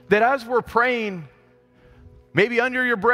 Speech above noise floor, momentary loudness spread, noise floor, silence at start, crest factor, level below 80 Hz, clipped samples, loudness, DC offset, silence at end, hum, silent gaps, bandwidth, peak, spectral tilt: 35 dB; 8 LU; -55 dBFS; 0.1 s; 18 dB; -54 dBFS; under 0.1%; -21 LUFS; under 0.1%; 0 s; none; none; 15 kHz; -4 dBFS; -6 dB/octave